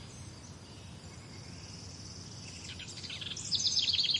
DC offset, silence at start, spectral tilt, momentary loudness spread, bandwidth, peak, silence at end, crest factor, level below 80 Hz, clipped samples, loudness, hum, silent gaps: under 0.1%; 0 s; -1 dB/octave; 21 LU; 11.5 kHz; -18 dBFS; 0 s; 20 dB; -62 dBFS; under 0.1%; -34 LUFS; none; none